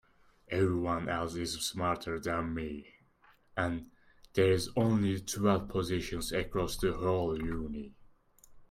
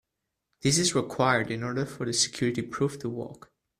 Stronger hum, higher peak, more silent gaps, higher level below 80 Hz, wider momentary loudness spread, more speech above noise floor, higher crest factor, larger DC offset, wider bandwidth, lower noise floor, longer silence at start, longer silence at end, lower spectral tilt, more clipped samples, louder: neither; second, -16 dBFS vs -8 dBFS; neither; first, -50 dBFS vs -60 dBFS; about the same, 10 LU vs 11 LU; second, 33 dB vs 56 dB; about the same, 18 dB vs 20 dB; neither; first, 16 kHz vs 14.5 kHz; second, -65 dBFS vs -84 dBFS; second, 0.5 s vs 0.65 s; second, 0.05 s vs 0.45 s; first, -5.5 dB/octave vs -3.5 dB/octave; neither; second, -33 LUFS vs -27 LUFS